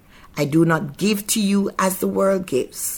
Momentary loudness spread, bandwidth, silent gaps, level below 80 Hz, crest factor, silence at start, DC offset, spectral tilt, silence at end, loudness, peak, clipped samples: 6 LU; 19 kHz; none; -52 dBFS; 14 dB; 0.35 s; under 0.1%; -5 dB/octave; 0 s; -20 LUFS; -6 dBFS; under 0.1%